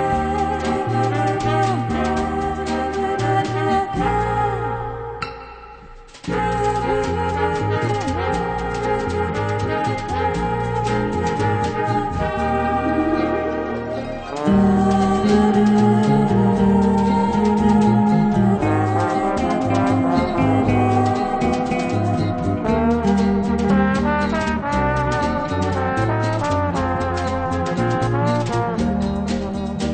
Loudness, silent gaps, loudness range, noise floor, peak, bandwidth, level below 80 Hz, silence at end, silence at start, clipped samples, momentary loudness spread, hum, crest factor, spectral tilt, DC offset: -19 LUFS; none; 6 LU; -40 dBFS; -4 dBFS; 9 kHz; -34 dBFS; 0 s; 0 s; under 0.1%; 7 LU; none; 14 dB; -7 dB/octave; under 0.1%